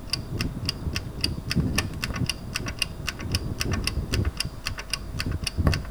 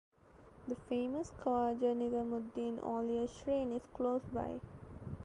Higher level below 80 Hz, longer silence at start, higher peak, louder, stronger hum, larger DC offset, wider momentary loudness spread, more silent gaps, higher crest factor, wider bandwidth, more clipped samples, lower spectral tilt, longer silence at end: first, -34 dBFS vs -62 dBFS; second, 0 s vs 0.35 s; first, -6 dBFS vs -22 dBFS; first, -29 LUFS vs -38 LUFS; neither; first, 0.1% vs under 0.1%; second, 6 LU vs 12 LU; neither; first, 24 dB vs 16 dB; first, over 20 kHz vs 10 kHz; neither; second, -4 dB/octave vs -7 dB/octave; about the same, 0 s vs 0 s